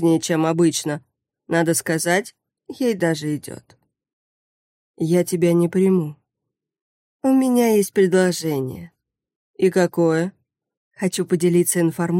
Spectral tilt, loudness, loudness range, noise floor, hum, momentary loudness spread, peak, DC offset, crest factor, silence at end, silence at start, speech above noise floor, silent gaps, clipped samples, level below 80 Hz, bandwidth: -5.5 dB/octave; -20 LUFS; 4 LU; -82 dBFS; none; 12 LU; -4 dBFS; under 0.1%; 16 dB; 0 s; 0 s; 63 dB; 4.13-4.94 s, 6.81-7.19 s, 9.36-9.54 s, 10.77-10.91 s; under 0.1%; -66 dBFS; 16.5 kHz